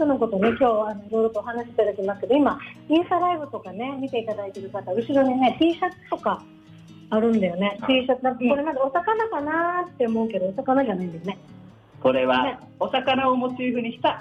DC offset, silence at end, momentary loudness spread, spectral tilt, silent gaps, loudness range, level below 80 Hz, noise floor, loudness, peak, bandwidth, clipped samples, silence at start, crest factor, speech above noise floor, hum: under 0.1%; 0 s; 10 LU; -7 dB/octave; none; 2 LU; -60 dBFS; -46 dBFS; -23 LUFS; -10 dBFS; 8.6 kHz; under 0.1%; 0 s; 14 dB; 23 dB; none